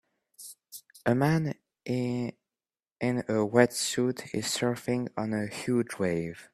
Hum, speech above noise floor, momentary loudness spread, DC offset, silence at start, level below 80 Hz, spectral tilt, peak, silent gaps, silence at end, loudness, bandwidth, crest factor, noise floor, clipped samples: none; over 62 dB; 17 LU; under 0.1%; 0.4 s; -66 dBFS; -5 dB/octave; -6 dBFS; none; 0.1 s; -29 LUFS; 14.5 kHz; 24 dB; under -90 dBFS; under 0.1%